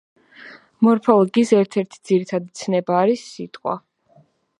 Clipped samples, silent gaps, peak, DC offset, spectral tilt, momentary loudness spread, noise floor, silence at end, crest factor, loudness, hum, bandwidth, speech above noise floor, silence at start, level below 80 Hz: under 0.1%; none; 0 dBFS; under 0.1%; -6.5 dB/octave; 12 LU; -56 dBFS; 0.8 s; 20 dB; -19 LUFS; none; 11 kHz; 38 dB; 0.45 s; -70 dBFS